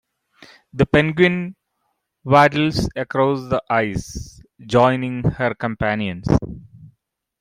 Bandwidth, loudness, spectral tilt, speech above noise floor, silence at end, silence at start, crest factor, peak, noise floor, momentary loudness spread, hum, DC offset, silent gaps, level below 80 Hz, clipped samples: 15.5 kHz; -19 LUFS; -6.5 dB/octave; 54 dB; 0.55 s; 0.75 s; 18 dB; -2 dBFS; -72 dBFS; 19 LU; none; under 0.1%; none; -40 dBFS; under 0.1%